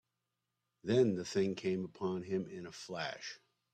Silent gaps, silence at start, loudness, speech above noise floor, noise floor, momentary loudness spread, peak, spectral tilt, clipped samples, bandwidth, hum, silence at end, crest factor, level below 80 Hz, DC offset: none; 0.85 s; -37 LUFS; 51 dB; -88 dBFS; 16 LU; -18 dBFS; -6 dB/octave; under 0.1%; 9.2 kHz; none; 0.4 s; 20 dB; -76 dBFS; under 0.1%